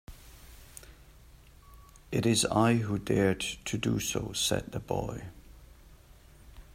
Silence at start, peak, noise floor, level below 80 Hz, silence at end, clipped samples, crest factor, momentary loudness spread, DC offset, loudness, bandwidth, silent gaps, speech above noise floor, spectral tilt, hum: 0.1 s; -10 dBFS; -55 dBFS; -52 dBFS; 0 s; under 0.1%; 22 dB; 24 LU; under 0.1%; -29 LUFS; 16 kHz; none; 26 dB; -4.5 dB/octave; none